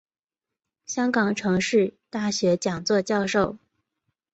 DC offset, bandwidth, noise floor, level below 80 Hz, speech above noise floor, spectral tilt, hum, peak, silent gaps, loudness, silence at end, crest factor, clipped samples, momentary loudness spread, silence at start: under 0.1%; 8.2 kHz; -87 dBFS; -60 dBFS; 64 dB; -4.5 dB/octave; none; -8 dBFS; none; -24 LUFS; 0.75 s; 18 dB; under 0.1%; 6 LU; 0.9 s